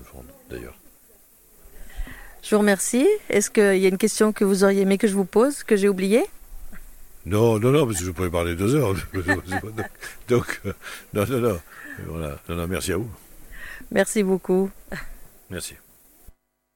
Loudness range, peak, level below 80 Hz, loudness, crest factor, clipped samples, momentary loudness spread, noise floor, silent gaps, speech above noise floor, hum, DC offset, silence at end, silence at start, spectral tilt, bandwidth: 7 LU; -6 dBFS; -44 dBFS; -22 LUFS; 18 dB; under 0.1%; 20 LU; -54 dBFS; none; 32 dB; none; under 0.1%; 1 s; 0 s; -5.5 dB/octave; 17.5 kHz